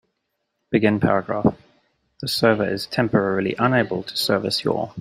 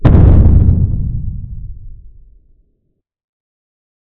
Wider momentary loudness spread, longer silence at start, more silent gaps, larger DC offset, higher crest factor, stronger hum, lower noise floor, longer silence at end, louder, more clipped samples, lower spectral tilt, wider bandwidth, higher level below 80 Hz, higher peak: second, 6 LU vs 23 LU; first, 0.7 s vs 0 s; neither; neither; first, 20 dB vs 12 dB; neither; first, -76 dBFS vs -66 dBFS; second, 0 s vs 1.9 s; second, -21 LUFS vs -11 LUFS; second, under 0.1% vs 2%; second, -5.5 dB/octave vs -12 dB/octave; first, 16 kHz vs 3.8 kHz; second, -54 dBFS vs -16 dBFS; about the same, -2 dBFS vs 0 dBFS